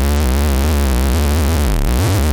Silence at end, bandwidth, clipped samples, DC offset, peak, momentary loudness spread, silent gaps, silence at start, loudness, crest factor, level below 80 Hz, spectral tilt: 0 s; 19.5 kHz; under 0.1%; under 0.1%; -2 dBFS; 1 LU; none; 0 s; -16 LUFS; 12 dB; -16 dBFS; -5.5 dB/octave